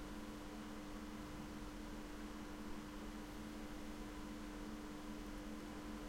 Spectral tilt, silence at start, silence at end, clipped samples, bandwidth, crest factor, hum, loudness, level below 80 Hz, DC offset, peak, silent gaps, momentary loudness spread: -5 dB/octave; 0 s; 0 s; under 0.1%; 16.5 kHz; 12 dB; none; -51 LUFS; -56 dBFS; under 0.1%; -38 dBFS; none; 1 LU